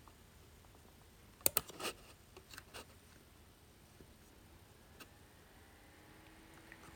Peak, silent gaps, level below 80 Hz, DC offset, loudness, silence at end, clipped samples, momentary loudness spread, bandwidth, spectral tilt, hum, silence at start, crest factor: -8 dBFS; none; -68 dBFS; under 0.1%; -40 LUFS; 0 s; under 0.1%; 25 LU; 17 kHz; -1.5 dB/octave; none; 0 s; 40 dB